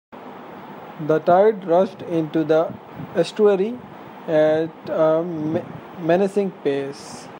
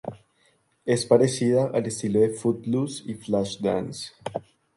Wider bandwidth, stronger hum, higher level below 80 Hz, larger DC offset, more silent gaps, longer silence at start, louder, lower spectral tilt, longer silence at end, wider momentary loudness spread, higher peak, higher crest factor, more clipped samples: first, 16 kHz vs 11.5 kHz; neither; second, -68 dBFS vs -60 dBFS; neither; neither; about the same, 0.15 s vs 0.05 s; first, -20 LUFS vs -25 LUFS; first, -7 dB/octave vs -5.5 dB/octave; second, 0 s vs 0.35 s; first, 21 LU vs 15 LU; about the same, -4 dBFS vs -4 dBFS; about the same, 16 dB vs 20 dB; neither